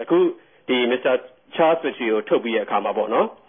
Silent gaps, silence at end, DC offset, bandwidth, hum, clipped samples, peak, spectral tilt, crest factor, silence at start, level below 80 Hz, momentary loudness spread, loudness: none; 0.15 s; under 0.1%; 3.7 kHz; none; under 0.1%; -4 dBFS; -9.5 dB/octave; 16 dB; 0 s; -78 dBFS; 5 LU; -21 LUFS